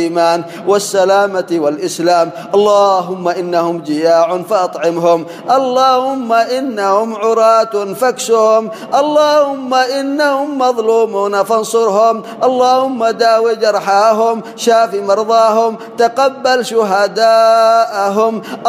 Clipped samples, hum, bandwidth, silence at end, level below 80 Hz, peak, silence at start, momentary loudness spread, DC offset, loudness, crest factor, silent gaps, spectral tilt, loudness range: under 0.1%; none; 15.5 kHz; 0 s; -70 dBFS; 0 dBFS; 0 s; 6 LU; under 0.1%; -12 LUFS; 12 dB; none; -4 dB/octave; 2 LU